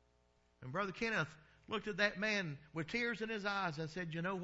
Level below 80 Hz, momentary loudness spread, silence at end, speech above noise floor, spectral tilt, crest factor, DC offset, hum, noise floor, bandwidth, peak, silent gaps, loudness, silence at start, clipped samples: -70 dBFS; 9 LU; 0 s; 34 dB; -3 dB/octave; 22 dB; under 0.1%; none; -74 dBFS; 7.6 kHz; -20 dBFS; none; -39 LUFS; 0.6 s; under 0.1%